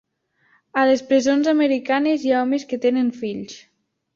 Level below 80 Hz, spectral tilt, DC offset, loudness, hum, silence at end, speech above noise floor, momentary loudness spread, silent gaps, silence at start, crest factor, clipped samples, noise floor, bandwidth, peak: -66 dBFS; -4.5 dB/octave; under 0.1%; -20 LUFS; none; 0.6 s; 45 dB; 12 LU; none; 0.75 s; 14 dB; under 0.1%; -64 dBFS; 7.4 kHz; -6 dBFS